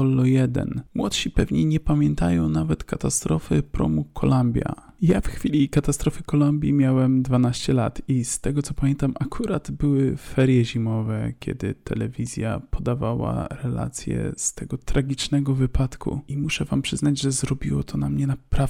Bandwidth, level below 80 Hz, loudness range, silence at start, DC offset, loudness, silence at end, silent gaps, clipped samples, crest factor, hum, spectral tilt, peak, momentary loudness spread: 15 kHz; -34 dBFS; 5 LU; 0 s; under 0.1%; -23 LUFS; 0 s; none; under 0.1%; 14 dB; none; -6 dB/octave; -8 dBFS; 8 LU